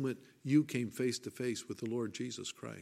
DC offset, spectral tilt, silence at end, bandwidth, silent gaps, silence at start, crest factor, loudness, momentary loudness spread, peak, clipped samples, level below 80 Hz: under 0.1%; -5.5 dB/octave; 0 s; 15 kHz; none; 0 s; 18 dB; -37 LUFS; 11 LU; -18 dBFS; under 0.1%; -80 dBFS